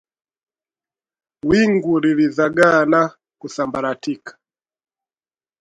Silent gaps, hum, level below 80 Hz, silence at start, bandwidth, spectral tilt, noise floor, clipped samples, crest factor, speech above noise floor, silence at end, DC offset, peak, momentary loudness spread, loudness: none; none; -54 dBFS; 1.45 s; 11 kHz; -6 dB/octave; under -90 dBFS; under 0.1%; 20 dB; over 73 dB; 1.3 s; under 0.1%; 0 dBFS; 14 LU; -17 LUFS